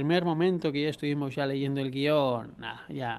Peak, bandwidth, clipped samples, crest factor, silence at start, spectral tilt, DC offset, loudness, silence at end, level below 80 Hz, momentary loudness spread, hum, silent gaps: -12 dBFS; 13.5 kHz; under 0.1%; 16 dB; 0 s; -7.5 dB/octave; under 0.1%; -29 LUFS; 0 s; -66 dBFS; 11 LU; none; none